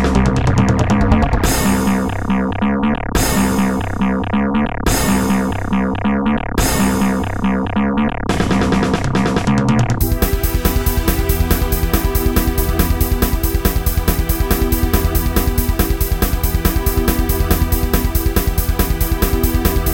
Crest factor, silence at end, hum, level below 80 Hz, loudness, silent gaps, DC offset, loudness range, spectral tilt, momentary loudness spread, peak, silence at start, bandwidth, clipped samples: 16 dB; 0 s; none; -20 dBFS; -16 LUFS; none; 1%; 1 LU; -5.5 dB/octave; 3 LU; 0 dBFS; 0 s; 17.5 kHz; under 0.1%